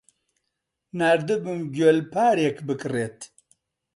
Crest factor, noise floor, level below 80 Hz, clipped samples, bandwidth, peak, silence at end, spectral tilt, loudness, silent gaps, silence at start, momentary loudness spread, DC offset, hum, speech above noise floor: 18 dB; -80 dBFS; -68 dBFS; under 0.1%; 11.5 kHz; -8 dBFS; 0.7 s; -6 dB/octave; -23 LUFS; none; 0.95 s; 15 LU; under 0.1%; none; 58 dB